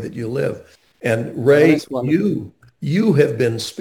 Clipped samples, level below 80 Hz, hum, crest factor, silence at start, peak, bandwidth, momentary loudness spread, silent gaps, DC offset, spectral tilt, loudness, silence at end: under 0.1%; -58 dBFS; none; 18 dB; 0 s; 0 dBFS; 17 kHz; 14 LU; none; under 0.1%; -7 dB/octave; -18 LUFS; 0 s